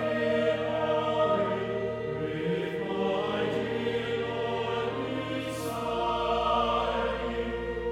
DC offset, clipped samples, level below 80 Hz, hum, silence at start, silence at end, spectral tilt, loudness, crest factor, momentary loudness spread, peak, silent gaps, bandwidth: under 0.1%; under 0.1%; -48 dBFS; none; 0 s; 0 s; -6 dB/octave; -29 LUFS; 14 dB; 6 LU; -14 dBFS; none; 15.5 kHz